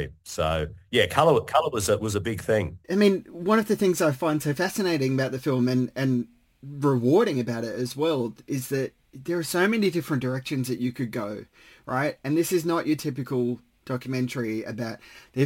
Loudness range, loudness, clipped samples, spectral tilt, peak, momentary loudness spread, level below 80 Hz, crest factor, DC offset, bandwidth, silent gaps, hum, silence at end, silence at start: 4 LU; -26 LUFS; under 0.1%; -5.5 dB/octave; -6 dBFS; 11 LU; -52 dBFS; 18 dB; under 0.1%; 17 kHz; none; none; 0 s; 0 s